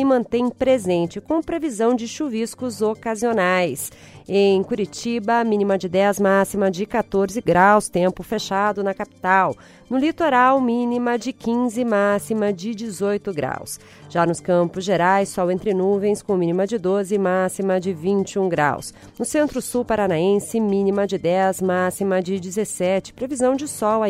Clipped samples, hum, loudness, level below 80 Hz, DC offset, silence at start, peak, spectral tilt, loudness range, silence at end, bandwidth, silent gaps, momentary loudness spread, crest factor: under 0.1%; none; -20 LUFS; -54 dBFS; under 0.1%; 0 s; -2 dBFS; -5.5 dB/octave; 3 LU; 0 s; 16 kHz; none; 8 LU; 18 dB